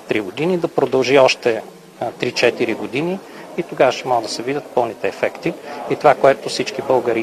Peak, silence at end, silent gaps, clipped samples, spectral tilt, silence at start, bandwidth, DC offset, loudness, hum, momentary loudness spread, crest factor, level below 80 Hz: 0 dBFS; 0 s; none; under 0.1%; -4.5 dB/octave; 0 s; 13.5 kHz; under 0.1%; -18 LUFS; none; 13 LU; 18 dB; -60 dBFS